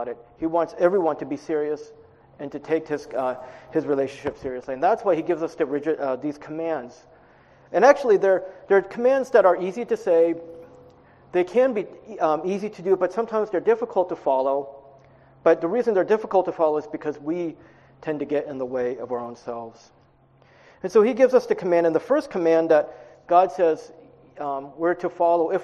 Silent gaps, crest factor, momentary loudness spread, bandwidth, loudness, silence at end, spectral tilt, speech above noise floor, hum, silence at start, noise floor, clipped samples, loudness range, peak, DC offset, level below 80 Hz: none; 22 dB; 13 LU; 8.4 kHz; -23 LUFS; 0 s; -6.5 dB/octave; 35 dB; none; 0 s; -57 dBFS; under 0.1%; 7 LU; -2 dBFS; under 0.1%; -64 dBFS